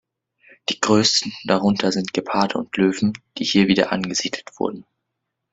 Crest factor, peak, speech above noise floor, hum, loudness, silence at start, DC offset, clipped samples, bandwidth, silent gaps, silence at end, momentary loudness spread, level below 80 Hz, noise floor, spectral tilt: 20 dB; -2 dBFS; 59 dB; none; -20 LUFS; 0.7 s; under 0.1%; under 0.1%; 8.2 kHz; none; 0.7 s; 11 LU; -58 dBFS; -79 dBFS; -4 dB/octave